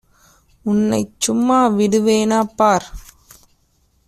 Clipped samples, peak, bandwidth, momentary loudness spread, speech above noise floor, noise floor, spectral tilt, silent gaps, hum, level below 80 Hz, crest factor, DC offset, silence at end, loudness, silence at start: under 0.1%; -2 dBFS; 14.5 kHz; 6 LU; 44 dB; -60 dBFS; -5 dB/octave; none; none; -46 dBFS; 16 dB; under 0.1%; 1.05 s; -16 LUFS; 0.65 s